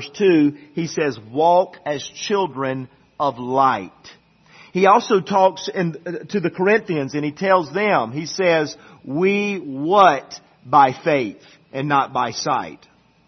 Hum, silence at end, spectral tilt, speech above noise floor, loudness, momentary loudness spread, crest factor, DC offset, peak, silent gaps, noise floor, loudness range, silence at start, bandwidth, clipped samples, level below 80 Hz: none; 0.55 s; -5.5 dB/octave; 30 dB; -19 LUFS; 13 LU; 18 dB; under 0.1%; 0 dBFS; none; -49 dBFS; 3 LU; 0 s; 6.4 kHz; under 0.1%; -64 dBFS